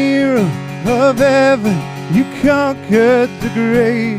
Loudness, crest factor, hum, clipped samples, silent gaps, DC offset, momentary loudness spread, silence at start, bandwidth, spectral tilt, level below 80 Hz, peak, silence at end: -14 LUFS; 12 dB; none; under 0.1%; none; under 0.1%; 7 LU; 0 s; 16 kHz; -6.5 dB/octave; -42 dBFS; 0 dBFS; 0 s